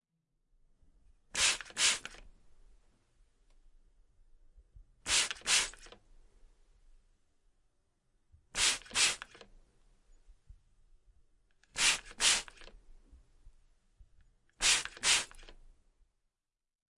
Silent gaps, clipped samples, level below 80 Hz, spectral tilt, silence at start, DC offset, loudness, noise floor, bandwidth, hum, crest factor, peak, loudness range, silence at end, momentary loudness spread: none; under 0.1%; -60 dBFS; 2 dB/octave; 1.35 s; under 0.1%; -30 LUFS; -90 dBFS; 11.5 kHz; none; 26 dB; -12 dBFS; 4 LU; 1.45 s; 16 LU